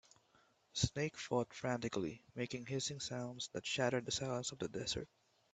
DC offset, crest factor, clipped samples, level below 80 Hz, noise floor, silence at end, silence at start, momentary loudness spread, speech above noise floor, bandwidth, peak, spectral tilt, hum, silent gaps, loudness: under 0.1%; 24 dB; under 0.1%; -64 dBFS; -73 dBFS; 0.5 s; 0.75 s; 7 LU; 32 dB; 9 kHz; -18 dBFS; -4 dB/octave; none; none; -41 LUFS